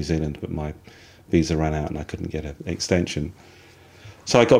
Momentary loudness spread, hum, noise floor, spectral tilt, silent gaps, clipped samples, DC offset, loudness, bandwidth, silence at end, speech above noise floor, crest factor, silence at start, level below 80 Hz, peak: 15 LU; none; -47 dBFS; -5.5 dB/octave; none; under 0.1%; under 0.1%; -25 LUFS; 15.5 kHz; 0 s; 24 dB; 22 dB; 0 s; -40 dBFS; -2 dBFS